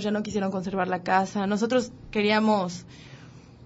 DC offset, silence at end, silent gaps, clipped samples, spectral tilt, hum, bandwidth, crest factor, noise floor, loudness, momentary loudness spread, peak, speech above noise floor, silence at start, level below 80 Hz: under 0.1%; 0 s; none; under 0.1%; -5.5 dB/octave; none; 8 kHz; 18 dB; -47 dBFS; -26 LUFS; 18 LU; -8 dBFS; 22 dB; 0 s; -56 dBFS